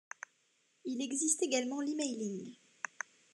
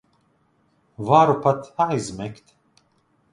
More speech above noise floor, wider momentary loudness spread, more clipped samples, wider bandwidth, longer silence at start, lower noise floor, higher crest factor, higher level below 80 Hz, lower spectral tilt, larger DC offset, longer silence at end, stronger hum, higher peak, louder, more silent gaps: second, 39 dB vs 44 dB; about the same, 18 LU vs 17 LU; neither; about the same, 12.5 kHz vs 11.5 kHz; second, 0.85 s vs 1 s; first, -75 dBFS vs -64 dBFS; about the same, 22 dB vs 22 dB; second, under -90 dBFS vs -60 dBFS; second, -2.5 dB/octave vs -6.5 dB/octave; neither; second, 0.8 s vs 1 s; neither; second, -16 dBFS vs -2 dBFS; second, -36 LUFS vs -20 LUFS; neither